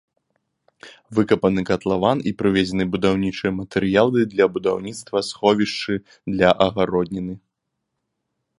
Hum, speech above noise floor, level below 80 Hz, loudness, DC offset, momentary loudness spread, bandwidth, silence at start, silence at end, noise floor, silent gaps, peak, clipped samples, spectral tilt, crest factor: none; 58 dB; -50 dBFS; -20 LUFS; under 0.1%; 9 LU; 11.5 kHz; 0.85 s; 1.2 s; -78 dBFS; none; 0 dBFS; under 0.1%; -6 dB/octave; 20 dB